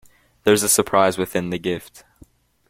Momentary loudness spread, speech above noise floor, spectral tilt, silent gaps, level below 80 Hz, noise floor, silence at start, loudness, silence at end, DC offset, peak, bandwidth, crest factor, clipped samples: 10 LU; 33 dB; -3.5 dB/octave; none; -54 dBFS; -52 dBFS; 0.45 s; -19 LUFS; 0.9 s; under 0.1%; -2 dBFS; 16.5 kHz; 20 dB; under 0.1%